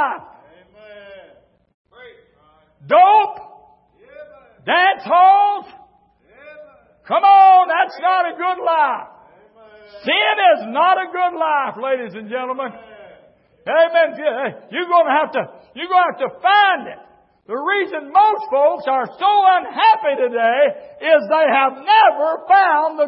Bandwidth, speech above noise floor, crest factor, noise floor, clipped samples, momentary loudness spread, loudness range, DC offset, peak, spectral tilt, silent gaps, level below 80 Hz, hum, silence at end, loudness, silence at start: 5.8 kHz; 40 dB; 16 dB; -55 dBFS; under 0.1%; 13 LU; 5 LU; under 0.1%; -2 dBFS; -8 dB/octave; 1.74-1.85 s; -70 dBFS; none; 0 s; -15 LUFS; 0 s